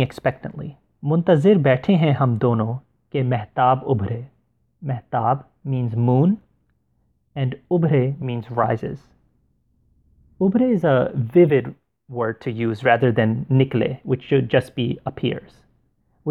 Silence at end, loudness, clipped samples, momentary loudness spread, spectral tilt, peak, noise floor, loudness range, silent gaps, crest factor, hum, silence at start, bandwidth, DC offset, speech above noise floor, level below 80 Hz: 0 s; -20 LUFS; under 0.1%; 14 LU; -9.5 dB/octave; -2 dBFS; -66 dBFS; 5 LU; none; 18 dB; none; 0 s; 4.8 kHz; under 0.1%; 47 dB; -56 dBFS